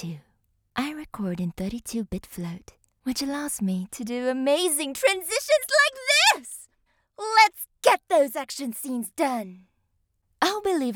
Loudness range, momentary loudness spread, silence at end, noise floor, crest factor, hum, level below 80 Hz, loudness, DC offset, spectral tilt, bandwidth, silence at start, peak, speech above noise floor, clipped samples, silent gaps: 10 LU; 17 LU; 0 s; -72 dBFS; 24 dB; none; -56 dBFS; -24 LUFS; under 0.1%; -3 dB/octave; over 20 kHz; 0 s; -2 dBFS; 47 dB; under 0.1%; none